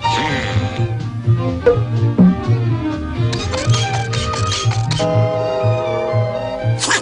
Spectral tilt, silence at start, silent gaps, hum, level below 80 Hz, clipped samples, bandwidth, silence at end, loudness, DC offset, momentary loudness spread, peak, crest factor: -5.5 dB/octave; 0 s; none; none; -36 dBFS; under 0.1%; 10.5 kHz; 0 s; -17 LUFS; under 0.1%; 6 LU; 0 dBFS; 16 dB